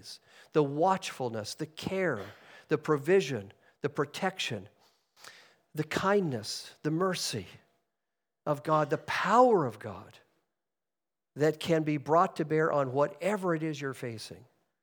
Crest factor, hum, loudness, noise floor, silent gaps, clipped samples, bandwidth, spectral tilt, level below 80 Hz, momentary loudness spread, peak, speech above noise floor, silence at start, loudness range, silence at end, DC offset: 22 dB; none; -30 LUFS; under -90 dBFS; none; under 0.1%; over 20 kHz; -5.5 dB/octave; -74 dBFS; 15 LU; -10 dBFS; over 60 dB; 0.05 s; 4 LU; 0.4 s; under 0.1%